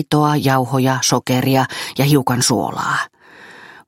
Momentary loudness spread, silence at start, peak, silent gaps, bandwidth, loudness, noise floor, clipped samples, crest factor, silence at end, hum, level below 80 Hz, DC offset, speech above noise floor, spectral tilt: 5 LU; 0 s; 0 dBFS; none; 16.5 kHz; -16 LUFS; -42 dBFS; under 0.1%; 16 dB; 0.15 s; none; -54 dBFS; under 0.1%; 26 dB; -4.5 dB/octave